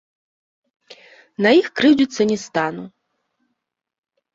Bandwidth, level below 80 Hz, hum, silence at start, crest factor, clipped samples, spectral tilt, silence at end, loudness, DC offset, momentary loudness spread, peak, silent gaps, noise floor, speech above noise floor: 7.8 kHz; -62 dBFS; none; 0.9 s; 20 dB; under 0.1%; -5 dB/octave; 1.45 s; -17 LUFS; under 0.1%; 13 LU; -2 dBFS; none; -77 dBFS; 60 dB